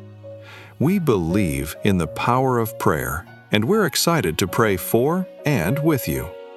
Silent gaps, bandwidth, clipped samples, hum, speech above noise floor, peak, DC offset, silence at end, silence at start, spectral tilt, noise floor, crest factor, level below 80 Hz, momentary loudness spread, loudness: none; 16 kHz; under 0.1%; none; 20 dB; 0 dBFS; under 0.1%; 0 s; 0 s; -5.5 dB/octave; -40 dBFS; 20 dB; -42 dBFS; 10 LU; -20 LUFS